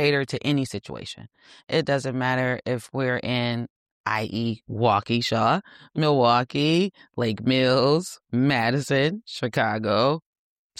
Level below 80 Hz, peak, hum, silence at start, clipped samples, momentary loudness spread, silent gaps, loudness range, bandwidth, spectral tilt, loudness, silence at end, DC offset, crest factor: -60 dBFS; -8 dBFS; none; 0 s; under 0.1%; 11 LU; 3.70-4.04 s; 4 LU; 14.5 kHz; -6 dB/octave; -24 LUFS; 0.6 s; under 0.1%; 16 dB